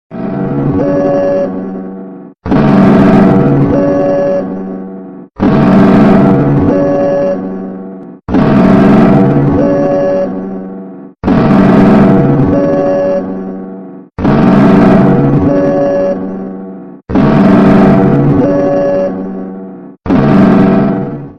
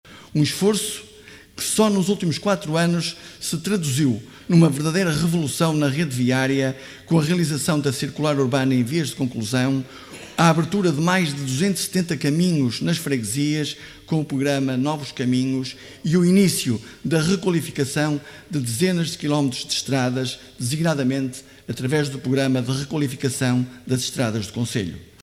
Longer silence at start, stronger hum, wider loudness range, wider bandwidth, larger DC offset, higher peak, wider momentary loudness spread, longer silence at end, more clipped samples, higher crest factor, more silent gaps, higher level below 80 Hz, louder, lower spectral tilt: about the same, 0.1 s vs 0.05 s; neither; second, 0 LU vs 3 LU; second, 6.2 kHz vs 16 kHz; neither; about the same, 0 dBFS vs -2 dBFS; first, 19 LU vs 9 LU; second, 0.05 s vs 0.2 s; first, 1% vs under 0.1%; second, 8 dB vs 18 dB; neither; first, -32 dBFS vs -56 dBFS; first, -8 LUFS vs -22 LUFS; first, -10 dB/octave vs -5 dB/octave